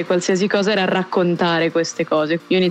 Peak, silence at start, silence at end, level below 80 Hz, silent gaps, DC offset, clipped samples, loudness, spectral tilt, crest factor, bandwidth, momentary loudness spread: -4 dBFS; 0 s; 0 s; -68 dBFS; none; under 0.1%; under 0.1%; -18 LUFS; -5 dB/octave; 14 dB; 9.2 kHz; 3 LU